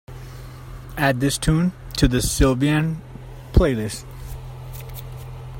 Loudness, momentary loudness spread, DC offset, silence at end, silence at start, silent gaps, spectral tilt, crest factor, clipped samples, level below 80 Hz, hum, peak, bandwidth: -20 LUFS; 20 LU; under 0.1%; 0 s; 0.1 s; none; -5.5 dB/octave; 20 dB; under 0.1%; -30 dBFS; none; -2 dBFS; 16.5 kHz